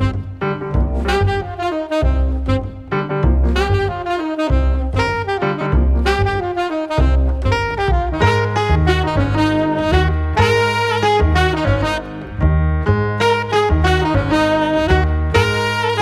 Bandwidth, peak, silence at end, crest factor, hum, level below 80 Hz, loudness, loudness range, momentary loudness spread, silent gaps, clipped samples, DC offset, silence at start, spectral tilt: 12 kHz; 0 dBFS; 0 s; 16 dB; none; -20 dBFS; -17 LUFS; 3 LU; 6 LU; none; under 0.1%; under 0.1%; 0 s; -6.5 dB/octave